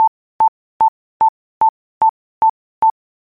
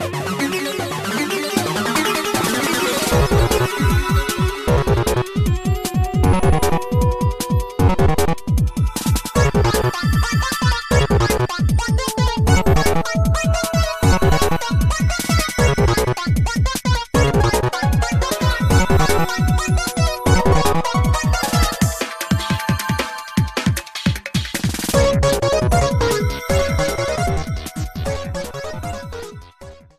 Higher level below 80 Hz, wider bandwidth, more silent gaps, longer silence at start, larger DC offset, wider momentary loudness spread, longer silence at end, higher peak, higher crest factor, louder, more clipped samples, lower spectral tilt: second, -60 dBFS vs -24 dBFS; second, 3.3 kHz vs 15.5 kHz; first, 0.08-0.39 s, 0.48-0.80 s, 0.88-1.20 s, 1.29-1.61 s, 1.69-2.01 s, 2.09-2.41 s, 2.50-2.82 s vs none; about the same, 0 s vs 0 s; neither; second, 0 LU vs 6 LU; about the same, 0.3 s vs 0.25 s; second, -6 dBFS vs -2 dBFS; about the same, 12 dB vs 16 dB; about the same, -17 LUFS vs -18 LUFS; neither; about the same, -6 dB/octave vs -5 dB/octave